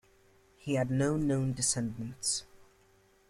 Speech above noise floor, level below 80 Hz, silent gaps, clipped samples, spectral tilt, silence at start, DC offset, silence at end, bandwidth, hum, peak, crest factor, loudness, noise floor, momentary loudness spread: 34 dB; -58 dBFS; none; under 0.1%; -4.5 dB/octave; 0.65 s; under 0.1%; 0.65 s; 15 kHz; none; -18 dBFS; 16 dB; -31 LUFS; -65 dBFS; 6 LU